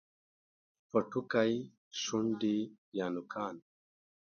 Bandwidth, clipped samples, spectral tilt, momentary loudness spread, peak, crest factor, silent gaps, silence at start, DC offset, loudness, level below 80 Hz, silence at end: 7 kHz; under 0.1%; -4.5 dB/octave; 10 LU; -16 dBFS; 22 dB; 1.78-1.91 s, 2.78-2.92 s; 0.95 s; under 0.1%; -35 LUFS; -76 dBFS; 0.75 s